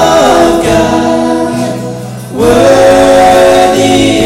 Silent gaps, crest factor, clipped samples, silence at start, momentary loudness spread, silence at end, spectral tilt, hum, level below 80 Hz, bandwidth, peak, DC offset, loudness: none; 6 dB; 8%; 0 s; 12 LU; 0 s; -4.5 dB/octave; none; -30 dBFS; 17 kHz; 0 dBFS; under 0.1%; -6 LUFS